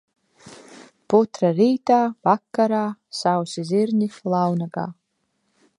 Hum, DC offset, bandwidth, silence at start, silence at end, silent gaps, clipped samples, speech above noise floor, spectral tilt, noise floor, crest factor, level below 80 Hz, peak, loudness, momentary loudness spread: none; under 0.1%; 11.5 kHz; 0.45 s; 0.85 s; none; under 0.1%; 52 dB; -6.5 dB/octave; -72 dBFS; 20 dB; -72 dBFS; -2 dBFS; -21 LUFS; 8 LU